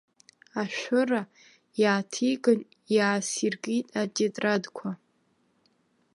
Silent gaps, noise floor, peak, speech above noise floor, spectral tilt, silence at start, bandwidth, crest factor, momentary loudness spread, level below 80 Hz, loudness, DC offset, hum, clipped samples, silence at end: none; -69 dBFS; -10 dBFS; 43 dB; -4 dB/octave; 0.55 s; 11.5 kHz; 20 dB; 13 LU; -80 dBFS; -27 LUFS; under 0.1%; none; under 0.1%; 1.2 s